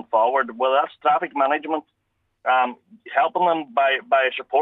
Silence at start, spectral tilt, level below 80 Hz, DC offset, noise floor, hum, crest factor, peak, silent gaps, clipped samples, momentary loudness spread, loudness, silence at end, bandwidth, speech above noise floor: 0.1 s; -5.5 dB/octave; -76 dBFS; under 0.1%; -53 dBFS; none; 16 dB; -6 dBFS; none; under 0.1%; 7 LU; -21 LUFS; 0 s; 4 kHz; 33 dB